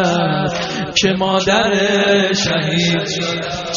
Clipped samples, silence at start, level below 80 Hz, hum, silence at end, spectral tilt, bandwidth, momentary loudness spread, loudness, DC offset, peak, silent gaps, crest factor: under 0.1%; 0 s; -46 dBFS; none; 0 s; -3 dB/octave; 7.4 kHz; 6 LU; -15 LUFS; under 0.1%; -2 dBFS; none; 14 dB